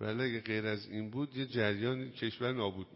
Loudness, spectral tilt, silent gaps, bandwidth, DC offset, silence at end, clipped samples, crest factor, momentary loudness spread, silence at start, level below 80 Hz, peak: -36 LUFS; -4.5 dB/octave; none; 5.8 kHz; under 0.1%; 0 s; under 0.1%; 20 dB; 6 LU; 0 s; -66 dBFS; -18 dBFS